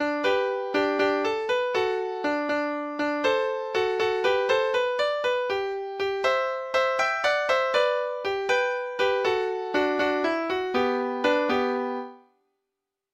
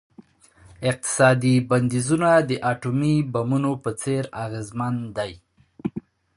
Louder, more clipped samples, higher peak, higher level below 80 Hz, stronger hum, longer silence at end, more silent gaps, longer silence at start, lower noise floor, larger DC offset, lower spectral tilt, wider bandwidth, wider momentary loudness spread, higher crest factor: second, -25 LUFS vs -22 LUFS; neither; second, -10 dBFS vs -4 dBFS; second, -64 dBFS vs -56 dBFS; neither; first, 0.95 s vs 0.35 s; neither; second, 0 s vs 0.8 s; first, -84 dBFS vs -53 dBFS; neither; second, -3.5 dB/octave vs -6 dB/octave; about the same, 12.5 kHz vs 11.5 kHz; second, 5 LU vs 14 LU; about the same, 16 dB vs 20 dB